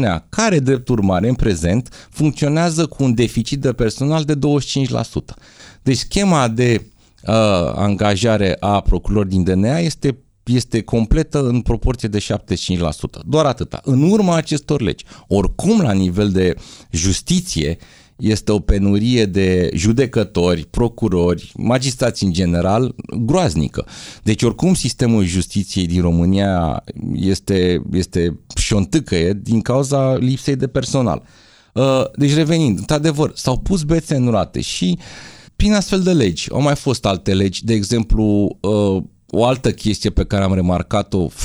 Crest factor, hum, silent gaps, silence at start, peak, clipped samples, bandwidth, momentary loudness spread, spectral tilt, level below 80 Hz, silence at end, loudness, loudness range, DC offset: 16 dB; none; none; 0 s; 0 dBFS; under 0.1%; over 20 kHz; 6 LU; -6 dB/octave; -30 dBFS; 0 s; -17 LUFS; 2 LU; under 0.1%